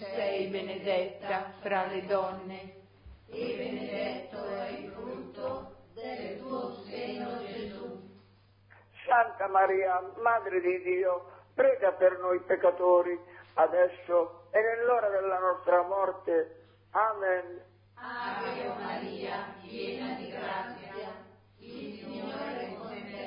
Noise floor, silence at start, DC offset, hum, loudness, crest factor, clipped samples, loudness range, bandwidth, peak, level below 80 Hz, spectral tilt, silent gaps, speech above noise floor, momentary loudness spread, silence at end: -61 dBFS; 0 s; under 0.1%; none; -31 LUFS; 18 dB; under 0.1%; 12 LU; 5.2 kHz; -12 dBFS; -68 dBFS; -3 dB/octave; none; 32 dB; 16 LU; 0 s